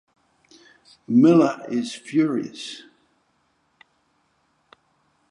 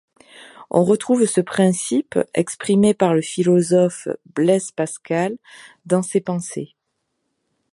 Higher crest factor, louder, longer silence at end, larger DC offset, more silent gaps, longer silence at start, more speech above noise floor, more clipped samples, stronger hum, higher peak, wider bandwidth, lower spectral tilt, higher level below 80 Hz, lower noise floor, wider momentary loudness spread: about the same, 20 dB vs 18 dB; about the same, -20 LUFS vs -19 LUFS; first, 2.55 s vs 1.1 s; neither; neither; first, 1.1 s vs 0.4 s; second, 47 dB vs 56 dB; neither; neither; second, -6 dBFS vs -2 dBFS; about the same, 10.5 kHz vs 11.5 kHz; about the same, -6.5 dB/octave vs -6 dB/octave; second, -76 dBFS vs -64 dBFS; second, -67 dBFS vs -74 dBFS; first, 20 LU vs 10 LU